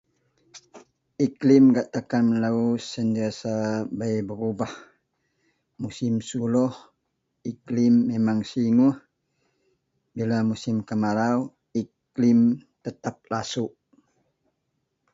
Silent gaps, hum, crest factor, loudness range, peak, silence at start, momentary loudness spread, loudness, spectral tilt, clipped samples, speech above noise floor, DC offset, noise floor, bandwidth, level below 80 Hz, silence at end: none; none; 18 dB; 7 LU; -6 dBFS; 0.55 s; 15 LU; -24 LUFS; -7 dB/octave; under 0.1%; 54 dB; under 0.1%; -76 dBFS; 7.8 kHz; -64 dBFS; 1.45 s